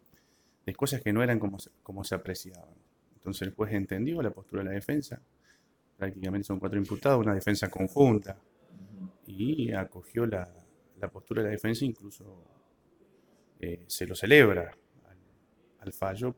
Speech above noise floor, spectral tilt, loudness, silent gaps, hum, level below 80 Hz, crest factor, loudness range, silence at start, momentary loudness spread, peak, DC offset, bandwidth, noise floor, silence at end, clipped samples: 38 dB; -6 dB/octave; -29 LUFS; none; none; -60 dBFS; 26 dB; 8 LU; 0.65 s; 21 LU; -6 dBFS; under 0.1%; over 20 kHz; -67 dBFS; 0.05 s; under 0.1%